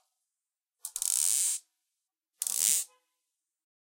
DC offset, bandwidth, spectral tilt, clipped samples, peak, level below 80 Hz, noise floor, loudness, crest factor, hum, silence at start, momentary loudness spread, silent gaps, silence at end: under 0.1%; 17 kHz; 4.5 dB/octave; under 0.1%; -8 dBFS; -86 dBFS; under -90 dBFS; -27 LUFS; 26 dB; none; 0.85 s; 15 LU; none; 0.95 s